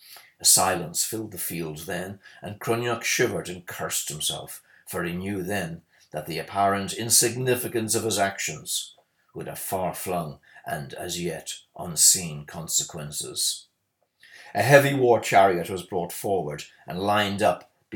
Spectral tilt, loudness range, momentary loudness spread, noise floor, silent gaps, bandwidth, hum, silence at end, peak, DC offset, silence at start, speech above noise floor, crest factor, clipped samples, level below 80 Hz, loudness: -2.5 dB/octave; 7 LU; 18 LU; -74 dBFS; none; over 20 kHz; none; 0 s; -2 dBFS; under 0.1%; 0.05 s; 49 dB; 24 dB; under 0.1%; -62 dBFS; -24 LUFS